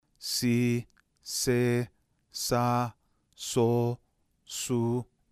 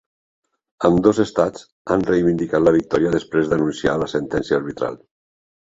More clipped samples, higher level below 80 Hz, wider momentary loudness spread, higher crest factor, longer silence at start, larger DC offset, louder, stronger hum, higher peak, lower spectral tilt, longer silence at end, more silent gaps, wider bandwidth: neither; second, -60 dBFS vs -46 dBFS; first, 13 LU vs 7 LU; about the same, 16 dB vs 18 dB; second, 0.2 s vs 0.8 s; neither; second, -29 LUFS vs -19 LUFS; neither; second, -14 dBFS vs -2 dBFS; second, -5 dB/octave vs -7 dB/octave; second, 0.25 s vs 0.7 s; second, none vs 1.72-1.85 s; first, 15.5 kHz vs 7.8 kHz